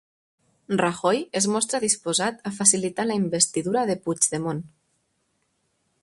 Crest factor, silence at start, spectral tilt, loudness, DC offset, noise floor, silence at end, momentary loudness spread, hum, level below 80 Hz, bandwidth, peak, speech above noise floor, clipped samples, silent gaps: 24 dB; 0.7 s; -3 dB/octave; -23 LUFS; under 0.1%; -72 dBFS; 1.35 s; 9 LU; none; -66 dBFS; 11.5 kHz; -2 dBFS; 48 dB; under 0.1%; none